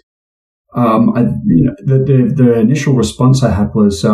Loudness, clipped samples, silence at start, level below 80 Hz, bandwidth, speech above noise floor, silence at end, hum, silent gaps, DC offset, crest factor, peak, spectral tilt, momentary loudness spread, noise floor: -12 LUFS; under 0.1%; 0.75 s; -36 dBFS; 12 kHz; over 80 dB; 0 s; none; none; under 0.1%; 10 dB; 0 dBFS; -7.5 dB/octave; 4 LU; under -90 dBFS